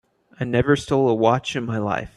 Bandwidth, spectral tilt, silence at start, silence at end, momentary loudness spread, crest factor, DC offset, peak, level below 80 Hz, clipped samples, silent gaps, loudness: 12 kHz; -6.5 dB/octave; 0.4 s; 0.1 s; 7 LU; 18 dB; under 0.1%; -4 dBFS; -48 dBFS; under 0.1%; none; -21 LUFS